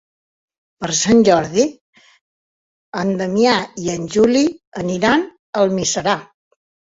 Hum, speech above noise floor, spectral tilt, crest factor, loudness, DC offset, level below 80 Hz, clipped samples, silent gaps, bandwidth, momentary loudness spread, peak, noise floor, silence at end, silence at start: none; over 74 dB; -4 dB/octave; 16 dB; -17 LUFS; under 0.1%; -52 dBFS; under 0.1%; 1.81-1.93 s, 2.21-2.92 s, 4.67-4.72 s, 5.39-5.53 s; 8 kHz; 11 LU; -2 dBFS; under -90 dBFS; 0.6 s; 0.8 s